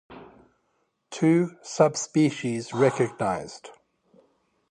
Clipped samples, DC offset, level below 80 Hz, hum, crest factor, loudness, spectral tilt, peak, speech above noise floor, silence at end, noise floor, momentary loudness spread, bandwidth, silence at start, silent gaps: under 0.1%; under 0.1%; -66 dBFS; none; 20 dB; -24 LUFS; -5.5 dB/octave; -6 dBFS; 49 dB; 1 s; -73 dBFS; 14 LU; 10 kHz; 0.1 s; none